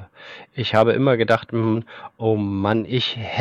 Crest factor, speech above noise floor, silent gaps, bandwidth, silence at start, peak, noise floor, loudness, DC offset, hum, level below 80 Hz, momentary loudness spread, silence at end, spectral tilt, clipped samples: 18 dB; 22 dB; none; 8.4 kHz; 0 s; -4 dBFS; -42 dBFS; -20 LUFS; under 0.1%; none; -58 dBFS; 18 LU; 0 s; -7.5 dB/octave; under 0.1%